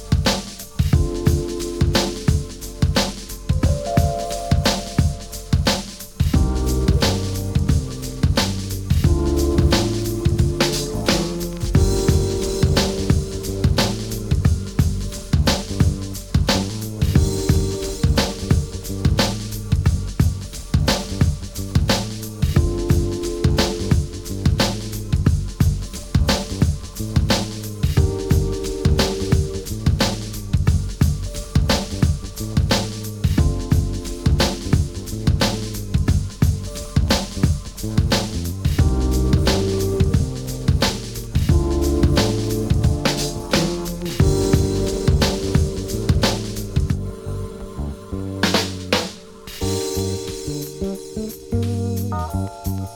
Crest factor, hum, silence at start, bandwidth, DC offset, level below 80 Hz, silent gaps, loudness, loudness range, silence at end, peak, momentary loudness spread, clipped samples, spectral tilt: 18 dB; none; 0 s; 18.5 kHz; under 0.1%; -26 dBFS; none; -21 LUFS; 2 LU; 0 s; -2 dBFS; 8 LU; under 0.1%; -5.5 dB/octave